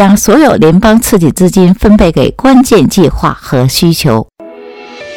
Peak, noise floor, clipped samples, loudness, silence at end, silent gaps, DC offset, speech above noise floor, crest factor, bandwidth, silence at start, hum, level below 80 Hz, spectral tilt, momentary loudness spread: 0 dBFS; -29 dBFS; 4%; -7 LUFS; 0 s; none; 0.7%; 23 dB; 6 dB; 18.5 kHz; 0 s; none; -24 dBFS; -5.5 dB/octave; 6 LU